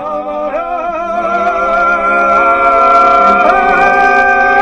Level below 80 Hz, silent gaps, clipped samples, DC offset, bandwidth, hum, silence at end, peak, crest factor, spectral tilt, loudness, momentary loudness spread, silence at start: -36 dBFS; none; 0.1%; under 0.1%; 9.2 kHz; none; 0 s; 0 dBFS; 10 dB; -4.5 dB/octave; -9 LUFS; 10 LU; 0 s